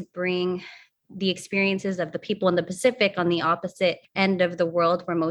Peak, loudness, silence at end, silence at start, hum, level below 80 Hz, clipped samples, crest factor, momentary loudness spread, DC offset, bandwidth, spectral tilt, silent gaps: -6 dBFS; -24 LUFS; 0 s; 0 s; none; -66 dBFS; under 0.1%; 18 dB; 7 LU; under 0.1%; 12.5 kHz; -5.5 dB/octave; none